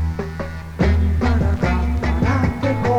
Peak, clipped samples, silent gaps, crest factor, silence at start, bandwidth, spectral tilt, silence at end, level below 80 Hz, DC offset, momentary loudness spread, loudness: -4 dBFS; under 0.1%; none; 14 dB; 0 s; 8 kHz; -8 dB/octave; 0 s; -22 dBFS; under 0.1%; 9 LU; -20 LUFS